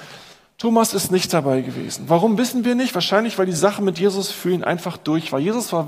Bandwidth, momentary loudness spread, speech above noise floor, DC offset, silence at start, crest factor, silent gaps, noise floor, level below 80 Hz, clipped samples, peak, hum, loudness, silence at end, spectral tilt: 15.5 kHz; 6 LU; 24 dB; under 0.1%; 0 s; 18 dB; none; -44 dBFS; -64 dBFS; under 0.1%; -2 dBFS; none; -20 LUFS; 0 s; -4.5 dB/octave